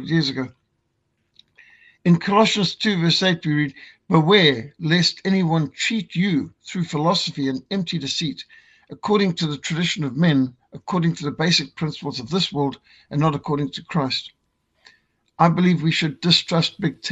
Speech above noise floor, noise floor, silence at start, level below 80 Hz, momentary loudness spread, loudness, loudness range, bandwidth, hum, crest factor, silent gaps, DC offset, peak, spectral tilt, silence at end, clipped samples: 51 dB; -71 dBFS; 0 s; -58 dBFS; 10 LU; -20 LUFS; 5 LU; 8.2 kHz; none; 20 dB; none; under 0.1%; -2 dBFS; -5.5 dB/octave; 0 s; under 0.1%